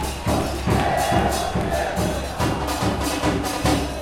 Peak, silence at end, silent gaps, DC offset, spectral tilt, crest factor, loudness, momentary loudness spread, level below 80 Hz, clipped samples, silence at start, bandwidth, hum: -6 dBFS; 0 s; none; under 0.1%; -5 dB/octave; 16 dB; -22 LUFS; 4 LU; -32 dBFS; under 0.1%; 0 s; 16.5 kHz; none